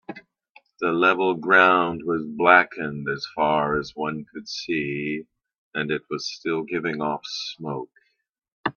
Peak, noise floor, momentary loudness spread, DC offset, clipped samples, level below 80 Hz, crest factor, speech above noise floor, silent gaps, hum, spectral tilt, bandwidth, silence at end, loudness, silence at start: 0 dBFS; -73 dBFS; 17 LU; under 0.1%; under 0.1%; -60 dBFS; 24 dB; 50 dB; 0.51-0.55 s, 5.58-5.71 s, 8.52-8.64 s; none; -5 dB/octave; 7 kHz; 0.05 s; -23 LUFS; 0.1 s